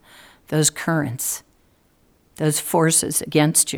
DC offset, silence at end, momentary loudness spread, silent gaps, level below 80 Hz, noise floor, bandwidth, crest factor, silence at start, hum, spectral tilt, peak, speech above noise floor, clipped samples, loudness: under 0.1%; 0 s; 9 LU; none; -58 dBFS; -59 dBFS; over 20 kHz; 20 dB; 0.5 s; none; -3.5 dB/octave; -2 dBFS; 40 dB; under 0.1%; -20 LUFS